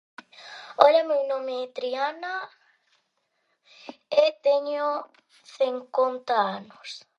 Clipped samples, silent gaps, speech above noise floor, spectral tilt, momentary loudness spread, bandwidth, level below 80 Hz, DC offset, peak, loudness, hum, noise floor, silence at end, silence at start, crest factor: under 0.1%; none; 49 dB; -3.5 dB/octave; 23 LU; 8.4 kHz; -80 dBFS; under 0.1%; 0 dBFS; -25 LUFS; none; -74 dBFS; 0.2 s; 0.4 s; 26 dB